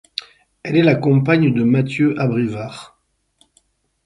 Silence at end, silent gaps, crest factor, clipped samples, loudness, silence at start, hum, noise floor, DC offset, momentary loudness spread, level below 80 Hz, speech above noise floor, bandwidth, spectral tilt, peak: 1.2 s; none; 16 dB; under 0.1%; -16 LUFS; 0.65 s; none; -61 dBFS; under 0.1%; 16 LU; -56 dBFS; 45 dB; 11 kHz; -8 dB/octave; -2 dBFS